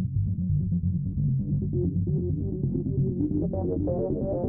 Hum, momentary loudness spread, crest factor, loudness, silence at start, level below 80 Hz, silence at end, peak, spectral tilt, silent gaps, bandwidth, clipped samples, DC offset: none; 2 LU; 12 dB; -28 LUFS; 0 s; -40 dBFS; 0 s; -14 dBFS; -17.5 dB/octave; none; 1.4 kHz; under 0.1%; under 0.1%